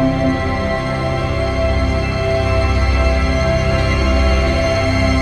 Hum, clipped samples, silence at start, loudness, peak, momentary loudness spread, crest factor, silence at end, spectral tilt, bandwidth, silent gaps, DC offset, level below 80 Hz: none; under 0.1%; 0 s; -16 LUFS; -2 dBFS; 4 LU; 12 dB; 0 s; -6.5 dB/octave; 11 kHz; none; under 0.1%; -20 dBFS